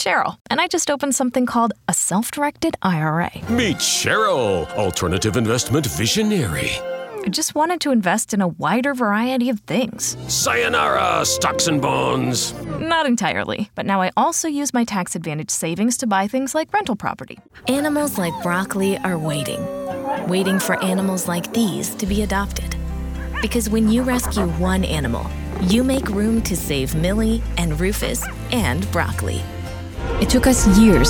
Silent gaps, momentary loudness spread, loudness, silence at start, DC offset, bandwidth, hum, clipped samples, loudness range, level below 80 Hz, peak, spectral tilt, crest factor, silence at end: 0.41-0.45 s; 8 LU; -20 LUFS; 0 s; under 0.1%; over 20 kHz; none; under 0.1%; 3 LU; -32 dBFS; -4 dBFS; -4 dB/octave; 16 dB; 0 s